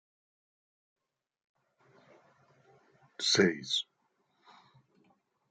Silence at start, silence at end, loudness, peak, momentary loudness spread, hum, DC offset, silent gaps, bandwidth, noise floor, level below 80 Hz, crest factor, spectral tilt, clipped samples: 3.2 s; 1.7 s; -29 LUFS; -12 dBFS; 20 LU; none; under 0.1%; none; 9.4 kHz; -76 dBFS; -82 dBFS; 26 dB; -3 dB/octave; under 0.1%